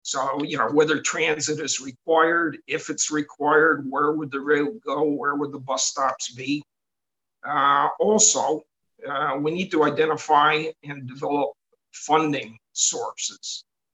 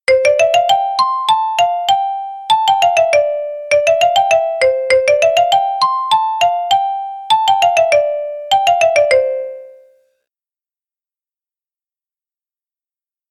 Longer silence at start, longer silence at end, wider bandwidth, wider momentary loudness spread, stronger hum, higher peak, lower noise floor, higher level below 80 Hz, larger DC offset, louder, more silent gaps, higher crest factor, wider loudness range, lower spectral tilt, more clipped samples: about the same, 0.05 s vs 0.1 s; second, 0.35 s vs 3.6 s; second, 9 kHz vs 14 kHz; first, 12 LU vs 8 LU; neither; second, -4 dBFS vs 0 dBFS; about the same, -88 dBFS vs under -90 dBFS; second, -74 dBFS vs -58 dBFS; neither; second, -22 LUFS vs -13 LUFS; neither; first, 20 dB vs 14 dB; about the same, 4 LU vs 4 LU; first, -2.5 dB/octave vs -0.5 dB/octave; neither